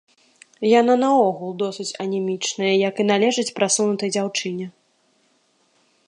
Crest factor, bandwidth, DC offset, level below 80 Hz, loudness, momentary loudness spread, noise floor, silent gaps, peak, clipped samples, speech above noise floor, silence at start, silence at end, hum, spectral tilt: 18 dB; 11.5 kHz; under 0.1%; -76 dBFS; -20 LUFS; 10 LU; -63 dBFS; none; -2 dBFS; under 0.1%; 43 dB; 0.6 s; 1.35 s; none; -3.5 dB/octave